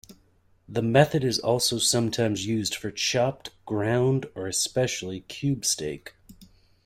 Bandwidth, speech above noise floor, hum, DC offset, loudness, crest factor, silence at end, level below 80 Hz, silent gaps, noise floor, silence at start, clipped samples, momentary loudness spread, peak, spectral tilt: 16 kHz; 37 dB; none; under 0.1%; -25 LUFS; 22 dB; 0.4 s; -58 dBFS; none; -62 dBFS; 0.1 s; under 0.1%; 11 LU; -6 dBFS; -4 dB/octave